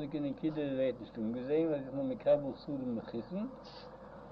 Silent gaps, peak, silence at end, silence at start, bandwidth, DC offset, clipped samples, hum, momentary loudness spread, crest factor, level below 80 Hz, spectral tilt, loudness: none; -18 dBFS; 0 s; 0 s; 6 kHz; under 0.1%; under 0.1%; none; 18 LU; 18 dB; -64 dBFS; -9.5 dB/octave; -36 LUFS